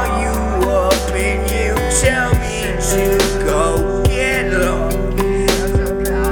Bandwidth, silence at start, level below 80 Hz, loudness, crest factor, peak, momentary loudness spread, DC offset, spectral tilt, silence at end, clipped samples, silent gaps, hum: 19.5 kHz; 0 s; -22 dBFS; -16 LUFS; 16 dB; 0 dBFS; 4 LU; under 0.1%; -4.5 dB/octave; 0 s; under 0.1%; none; none